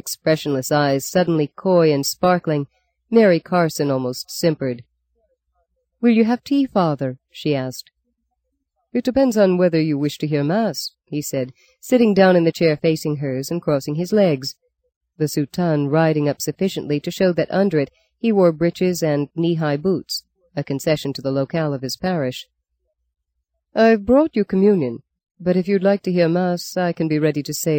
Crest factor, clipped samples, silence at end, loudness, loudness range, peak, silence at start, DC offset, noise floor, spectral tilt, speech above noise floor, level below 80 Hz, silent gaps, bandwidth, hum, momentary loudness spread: 18 dB; under 0.1%; 0 s; -19 LUFS; 4 LU; -2 dBFS; 0.05 s; under 0.1%; -75 dBFS; -6 dB/octave; 57 dB; -56 dBFS; 14.96-15.01 s, 25.31-25.35 s; 17 kHz; none; 11 LU